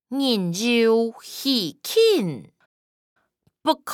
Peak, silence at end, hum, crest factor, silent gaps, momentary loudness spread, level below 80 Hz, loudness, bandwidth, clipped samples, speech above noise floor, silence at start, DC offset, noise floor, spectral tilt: -6 dBFS; 0 s; none; 18 dB; 2.66-3.16 s; 10 LU; -78 dBFS; -21 LUFS; 18.5 kHz; under 0.1%; over 69 dB; 0.1 s; under 0.1%; under -90 dBFS; -4.5 dB/octave